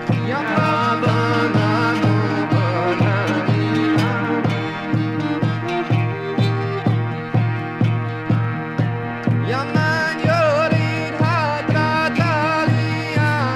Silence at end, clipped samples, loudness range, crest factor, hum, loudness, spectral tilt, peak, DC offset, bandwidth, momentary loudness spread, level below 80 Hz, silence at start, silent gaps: 0 s; under 0.1%; 3 LU; 16 dB; none; -19 LUFS; -7 dB/octave; -4 dBFS; under 0.1%; 10 kHz; 4 LU; -52 dBFS; 0 s; none